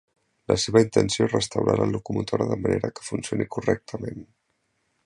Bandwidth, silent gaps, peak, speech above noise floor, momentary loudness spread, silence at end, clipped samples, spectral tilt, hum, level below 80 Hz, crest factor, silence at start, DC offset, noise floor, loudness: 11 kHz; none; -4 dBFS; 49 dB; 12 LU; 0.85 s; under 0.1%; -5.5 dB/octave; none; -50 dBFS; 22 dB; 0.5 s; under 0.1%; -73 dBFS; -24 LUFS